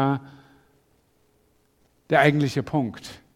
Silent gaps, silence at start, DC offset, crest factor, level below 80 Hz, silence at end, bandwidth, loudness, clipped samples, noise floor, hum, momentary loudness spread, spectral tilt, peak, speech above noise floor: none; 0 s; under 0.1%; 22 dB; -60 dBFS; 0.2 s; 15 kHz; -23 LUFS; under 0.1%; -64 dBFS; none; 13 LU; -6.5 dB/octave; -4 dBFS; 42 dB